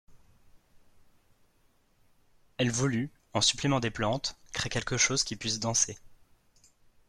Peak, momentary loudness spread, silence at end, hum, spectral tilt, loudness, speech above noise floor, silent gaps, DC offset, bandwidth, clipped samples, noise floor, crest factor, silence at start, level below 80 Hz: -12 dBFS; 9 LU; 0.95 s; none; -3 dB/octave; -29 LUFS; 38 dB; none; under 0.1%; 13.5 kHz; under 0.1%; -67 dBFS; 22 dB; 0.1 s; -56 dBFS